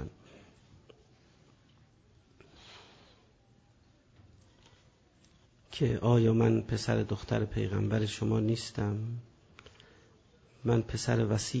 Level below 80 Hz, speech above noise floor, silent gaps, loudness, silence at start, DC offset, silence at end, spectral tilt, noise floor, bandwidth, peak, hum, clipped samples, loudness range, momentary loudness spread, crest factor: -54 dBFS; 35 dB; none; -31 LUFS; 0 s; under 0.1%; 0 s; -6.5 dB/octave; -64 dBFS; 8 kHz; -16 dBFS; none; under 0.1%; 5 LU; 19 LU; 18 dB